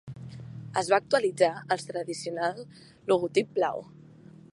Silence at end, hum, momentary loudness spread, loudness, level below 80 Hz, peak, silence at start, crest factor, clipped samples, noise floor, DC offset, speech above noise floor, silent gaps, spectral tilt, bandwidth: 0.05 s; none; 19 LU; -28 LUFS; -68 dBFS; -8 dBFS; 0.05 s; 22 dB; under 0.1%; -51 dBFS; under 0.1%; 23 dB; none; -4.5 dB/octave; 11.5 kHz